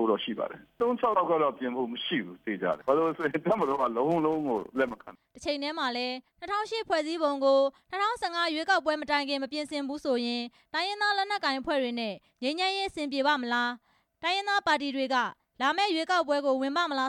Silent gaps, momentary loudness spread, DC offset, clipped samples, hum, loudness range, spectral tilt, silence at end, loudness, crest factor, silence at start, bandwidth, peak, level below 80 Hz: none; 8 LU; under 0.1%; under 0.1%; none; 2 LU; -4 dB/octave; 0 s; -29 LUFS; 18 dB; 0 s; 12.5 kHz; -10 dBFS; -68 dBFS